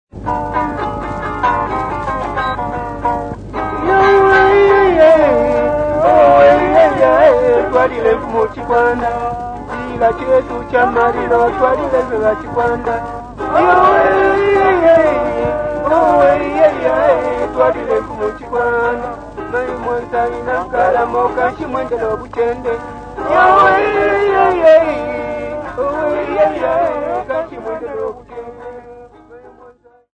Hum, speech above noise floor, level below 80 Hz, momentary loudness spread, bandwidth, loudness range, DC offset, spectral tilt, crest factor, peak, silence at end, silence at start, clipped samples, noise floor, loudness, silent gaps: none; 31 dB; -36 dBFS; 13 LU; 9.2 kHz; 8 LU; under 0.1%; -6.5 dB/octave; 14 dB; 0 dBFS; 0.45 s; 0.15 s; under 0.1%; -44 dBFS; -13 LUFS; none